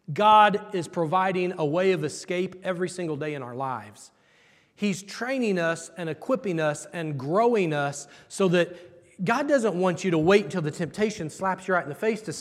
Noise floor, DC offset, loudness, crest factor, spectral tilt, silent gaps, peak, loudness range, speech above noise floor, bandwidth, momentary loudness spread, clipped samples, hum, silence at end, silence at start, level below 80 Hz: -60 dBFS; under 0.1%; -25 LUFS; 20 dB; -5.5 dB/octave; none; -4 dBFS; 6 LU; 35 dB; 13.5 kHz; 11 LU; under 0.1%; none; 0 s; 0.1 s; -70 dBFS